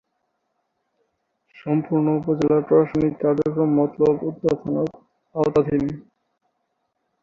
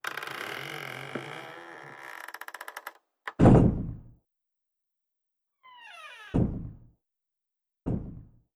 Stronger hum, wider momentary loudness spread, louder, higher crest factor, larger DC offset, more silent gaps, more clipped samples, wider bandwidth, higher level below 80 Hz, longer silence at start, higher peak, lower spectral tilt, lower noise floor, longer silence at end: neither; second, 9 LU vs 24 LU; first, -21 LUFS vs -27 LUFS; second, 16 dB vs 26 dB; neither; neither; neither; second, 7.2 kHz vs 15.5 kHz; second, -54 dBFS vs -42 dBFS; first, 1.55 s vs 0.05 s; about the same, -6 dBFS vs -6 dBFS; first, -9.5 dB/octave vs -7.5 dB/octave; second, -74 dBFS vs -88 dBFS; first, 1.2 s vs 0.3 s